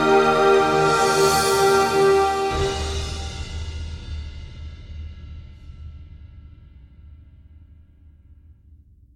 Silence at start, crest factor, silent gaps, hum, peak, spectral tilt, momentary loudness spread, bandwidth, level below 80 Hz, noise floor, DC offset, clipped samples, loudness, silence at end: 0 s; 18 dB; none; none; -4 dBFS; -4 dB/octave; 24 LU; 16.5 kHz; -38 dBFS; -50 dBFS; under 0.1%; under 0.1%; -19 LUFS; 2 s